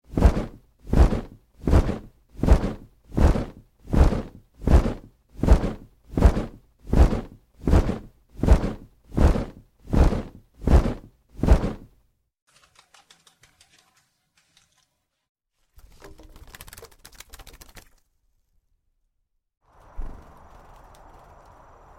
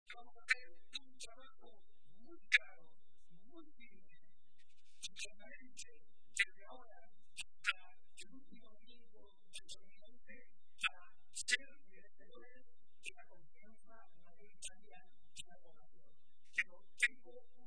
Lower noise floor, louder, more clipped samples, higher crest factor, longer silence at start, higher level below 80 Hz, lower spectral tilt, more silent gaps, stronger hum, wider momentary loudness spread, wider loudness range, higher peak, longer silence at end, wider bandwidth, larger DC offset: about the same, -74 dBFS vs -77 dBFS; first, -24 LUFS vs -41 LUFS; neither; second, 20 dB vs 34 dB; about the same, 0.1 s vs 0.05 s; first, -26 dBFS vs -76 dBFS; first, -8 dB/octave vs 0 dB/octave; first, 12.42-12.47 s, 15.29-15.35 s vs none; neither; second, 22 LU vs 26 LU; second, 3 LU vs 14 LU; first, -4 dBFS vs -14 dBFS; first, 1.8 s vs 0.3 s; first, 13 kHz vs 10.5 kHz; second, under 0.1% vs 0.5%